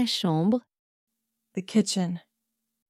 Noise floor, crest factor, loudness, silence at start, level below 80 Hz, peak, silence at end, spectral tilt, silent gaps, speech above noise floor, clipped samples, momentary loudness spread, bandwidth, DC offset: -82 dBFS; 18 dB; -26 LUFS; 0 s; -74 dBFS; -12 dBFS; 0.7 s; -5 dB/octave; 0.79-1.07 s; 56 dB; under 0.1%; 13 LU; 15 kHz; under 0.1%